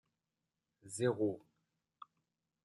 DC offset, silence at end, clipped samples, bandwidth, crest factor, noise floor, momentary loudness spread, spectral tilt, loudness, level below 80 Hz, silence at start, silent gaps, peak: under 0.1%; 1.25 s; under 0.1%; 12 kHz; 22 dB; -90 dBFS; 25 LU; -6 dB/octave; -38 LUFS; -86 dBFS; 0.85 s; none; -20 dBFS